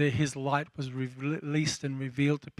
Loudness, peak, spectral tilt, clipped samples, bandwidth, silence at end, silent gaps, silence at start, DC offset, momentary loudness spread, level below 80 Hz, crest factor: -31 LUFS; -14 dBFS; -5.5 dB/octave; under 0.1%; 12 kHz; 0.1 s; none; 0 s; under 0.1%; 7 LU; -64 dBFS; 16 dB